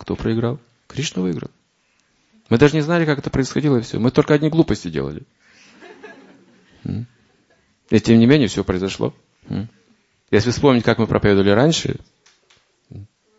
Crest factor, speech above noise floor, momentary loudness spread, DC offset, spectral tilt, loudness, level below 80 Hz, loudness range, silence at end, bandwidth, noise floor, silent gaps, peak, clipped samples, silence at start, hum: 20 dB; 46 dB; 15 LU; under 0.1%; -6 dB/octave; -18 LUFS; -44 dBFS; 5 LU; 0.35 s; 8 kHz; -63 dBFS; none; 0 dBFS; under 0.1%; 0 s; none